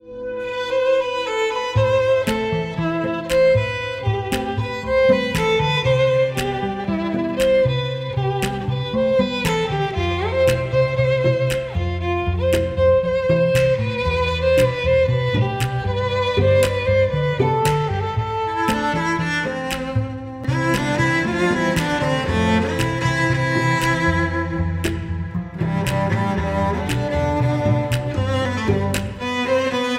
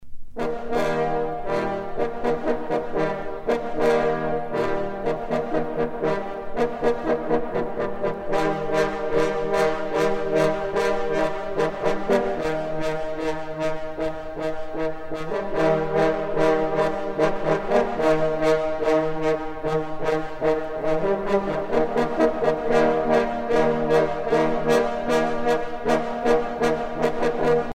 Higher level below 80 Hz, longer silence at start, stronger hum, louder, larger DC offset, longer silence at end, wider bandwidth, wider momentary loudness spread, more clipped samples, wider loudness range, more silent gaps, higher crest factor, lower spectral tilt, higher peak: about the same, -36 dBFS vs -40 dBFS; about the same, 0.05 s vs 0 s; neither; first, -20 LUFS vs -24 LUFS; neither; about the same, 0 s vs 0.05 s; first, 16 kHz vs 14.5 kHz; about the same, 7 LU vs 7 LU; neither; about the same, 3 LU vs 4 LU; neither; about the same, 14 dB vs 16 dB; about the same, -6 dB/octave vs -6 dB/octave; about the same, -4 dBFS vs -6 dBFS